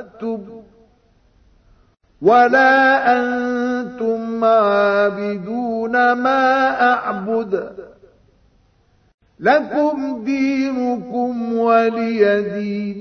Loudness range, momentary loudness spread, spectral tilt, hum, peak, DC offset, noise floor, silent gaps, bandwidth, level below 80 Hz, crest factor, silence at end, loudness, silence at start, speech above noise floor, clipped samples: 6 LU; 11 LU; -6 dB/octave; none; -2 dBFS; under 0.1%; -57 dBFS; 9.14-9.18 s; 6.6 kHz; -58 dBFS; 16 dB; 0 s; -17 LUFS; 0 s; 40 dB; under 0.1%